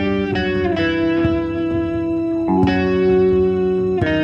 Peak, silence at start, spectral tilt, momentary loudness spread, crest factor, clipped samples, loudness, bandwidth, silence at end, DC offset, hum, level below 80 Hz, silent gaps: -4 dBFS; 0 s; -8.5 dB/octave; 6 LU; 12 dB; under 0.1%; -18 LUFS; 7 kHz; 0 s; under 0.1%; none; -36 dBFS; none